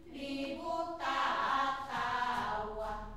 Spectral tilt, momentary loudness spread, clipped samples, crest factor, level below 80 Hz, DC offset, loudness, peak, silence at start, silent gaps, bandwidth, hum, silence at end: -4 dB/octave; 8 LU; under 0.1%; 16 dB; -56 dBFS; 0.1%; -35 LUFS; -22 dBFS; 0 s; none; 15.5 kHz; none; 0 s